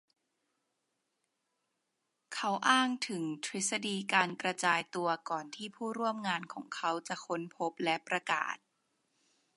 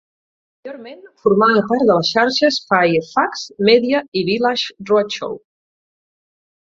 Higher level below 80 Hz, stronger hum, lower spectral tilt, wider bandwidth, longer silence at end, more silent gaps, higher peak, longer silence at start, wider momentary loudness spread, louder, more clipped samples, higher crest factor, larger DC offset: second, -88 dBFS vs -60 dBFS; neither; second, -2.5 dB/octave vs -5 dB/octave; first, 11.5 kHz vs 7.6 kHz; second, 1 s vs 1.3 s; second, none vs 4.08-4.12 s; second, -12 dBFS vs -2 dBFS; first, 2.3 s vs 0.65 s; second, 10 LU vs 16 LU; second, -34 LUFS vs -16 LUFS; neither; first, 24 dB vs 16 dB; neither